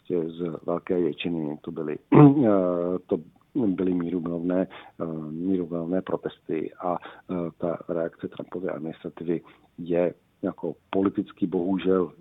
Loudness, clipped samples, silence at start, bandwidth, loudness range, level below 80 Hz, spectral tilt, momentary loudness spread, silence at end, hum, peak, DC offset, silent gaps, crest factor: -26 LUFS; under 0.1%; 0.1 s; 4 kHz; 9 LU; -62 dBFS; -11 dB/octave; 12 LU; 0.1 s; none; -2 dBFS; under 0.1%; none; 24 dB